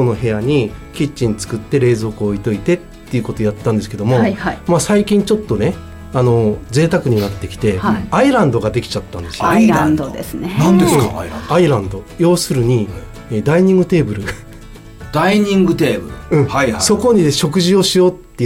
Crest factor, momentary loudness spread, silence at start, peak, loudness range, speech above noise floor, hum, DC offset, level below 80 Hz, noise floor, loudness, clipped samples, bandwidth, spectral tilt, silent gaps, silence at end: 12 dB; 11 LU; 0 s; -2 dBFS; 3 LU; 20 dB; none; under 0.1%; -36 dBFS; -34 dBFS; -15 LUFS; under 0.1%; 17 kHz; -6 dB/octave; none; 0 s